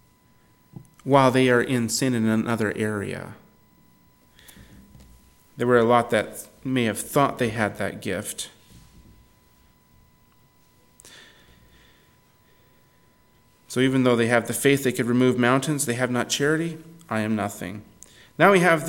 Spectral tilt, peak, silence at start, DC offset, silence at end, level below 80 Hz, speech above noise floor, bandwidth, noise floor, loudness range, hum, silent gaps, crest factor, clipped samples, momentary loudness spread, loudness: -5 dB/octave; -2 dBFS; 1.05 s; under 0.1%; 0 s; -60 dBFS; 37 dB; 17.5 kHz; -59 dBFS; 11 LU; none; none; 22 dB; under 0.1%; 16 LU; -22 LUFS